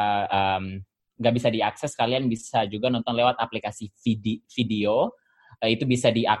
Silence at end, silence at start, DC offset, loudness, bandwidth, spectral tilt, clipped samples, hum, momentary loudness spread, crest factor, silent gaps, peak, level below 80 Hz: 0 s; 0 s; under 0.1%; -25 LUFS; 12 kHz; -5.5 dB/octave; under 0.1%; none; 8 LU; 20 dB; none; -4 dBFS; -60 dBFS